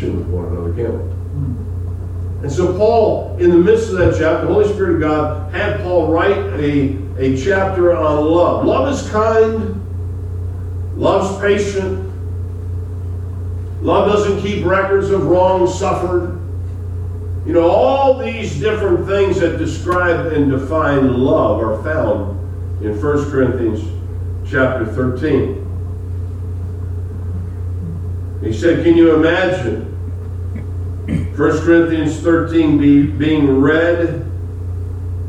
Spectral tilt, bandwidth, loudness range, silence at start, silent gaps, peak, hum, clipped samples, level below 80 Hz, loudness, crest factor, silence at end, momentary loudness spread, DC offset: -7.5 dB/octave; 9.4 kHz; 5 LU; 0 s; none; 0 dBFS; none; under 0.1%; -32 dBFS; -16 LUFS; 14 dB; 0 s; 12 LU; under 0.1%